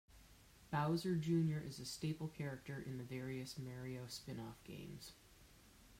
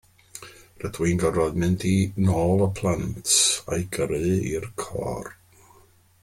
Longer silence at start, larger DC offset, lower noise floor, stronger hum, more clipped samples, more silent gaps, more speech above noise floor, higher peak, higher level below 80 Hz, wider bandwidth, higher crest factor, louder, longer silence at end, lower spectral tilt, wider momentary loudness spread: second, 0.1 s vs 0.35 s; neither; first, -65 dBFS vs -56 dBFS; neither; neither; neither; second, 22 dB vs 33 dB; second, -26 dBFS vs -6 dBFS; second, -68 dBFS vs -46 dBFS; about the same, 16 kHz vs 16 kHz; about the same, 18 dB vs 18 dB; second, -44 LUFS vs -23 LUFS; second, 0 s vs 0.9 s; first, -6 dB/octave vs -4.5 dB/octave; first, 26 LU vs 17 LU